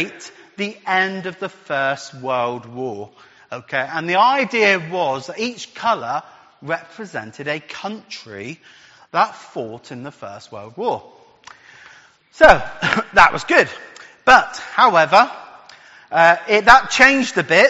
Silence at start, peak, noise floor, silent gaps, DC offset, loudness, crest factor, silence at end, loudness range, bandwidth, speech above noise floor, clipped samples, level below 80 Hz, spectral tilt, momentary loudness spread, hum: 0 s; 0 dBFS; -48 dBFS; none; under 0.1%; -16 LUFS; 18 dB; 0 s; 12 LU; 8 kHz; 30 dB; under 0.1%; -44 dBFS; -1.5 dB/octave; 22 LU; none